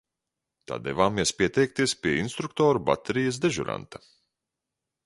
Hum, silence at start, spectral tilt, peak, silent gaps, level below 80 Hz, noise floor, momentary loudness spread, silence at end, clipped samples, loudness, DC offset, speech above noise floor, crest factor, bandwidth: none; 0.7 s; -4.5 dB/octave; -6 dBFS; none; -54 dBFS; -86 dBFS; 11 LU; 1.1 s; under 0.1%; -26 LUFS; under 0.1%; 60 dB; 20 dB; 11.5 kHz